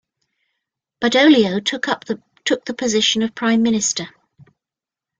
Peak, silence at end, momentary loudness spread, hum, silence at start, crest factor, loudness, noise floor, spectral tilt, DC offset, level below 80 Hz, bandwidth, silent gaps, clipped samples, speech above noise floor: -2 dBFS; 1.1 s; 12 LU; none; 1 s; 18 dB; -17 LUFS; -88 dBFS; -3 dB/octave; under 0.1%; -62 dBFS; 9.6 kHz; none; under 0.1%; 71 dB